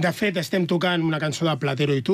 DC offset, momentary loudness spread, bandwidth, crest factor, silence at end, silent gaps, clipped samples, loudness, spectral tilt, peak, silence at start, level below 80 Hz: under 0.1%; 2 LU; 15.5 kHz; 12 dB; 0 s; none; under 0.1%; -23 LUFS; -5.5 dB/octave; -10 dBFS; 0 s; -60 dBFS